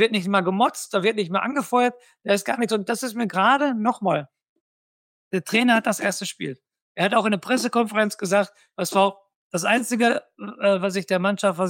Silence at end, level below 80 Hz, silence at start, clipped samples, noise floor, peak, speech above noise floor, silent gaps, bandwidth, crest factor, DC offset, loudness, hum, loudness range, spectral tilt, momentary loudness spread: 0 s; -74 dBFS; 0 s; under 0.1%; under -90 dBFS; -6 dBFS; over 68 dB; 4.49-5.31 s, 6.82-6.95 s, 9.35-9.50 s; 17 kHz; 18 dB; under 0.1%; -22 LUFS; none; 2 LU; -4 dB/octave; 10 LU